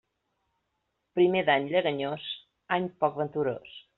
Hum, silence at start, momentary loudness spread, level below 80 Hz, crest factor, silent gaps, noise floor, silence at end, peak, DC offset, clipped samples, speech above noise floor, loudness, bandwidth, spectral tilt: none; 1.15 s; 12 LU; -70 dBFS; 18 dB; none; -79 dBFS; 0.2 s; -10 dBFS; under 0.1%; under 0.1%; 52 dB; -28 LUFS; 4.2 kHz; -3.5 dB/octave